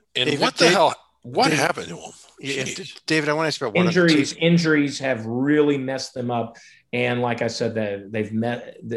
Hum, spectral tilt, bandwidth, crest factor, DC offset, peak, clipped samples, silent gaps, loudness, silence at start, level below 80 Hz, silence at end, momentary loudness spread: none; -4.5 dB/octave; 12.5 kHz; 20 dB; under 0.1%; -2 dBFS; under 0.1%; none; -21 LUFS; 0.15 s; -62 dBFS; 0 s; 13 LU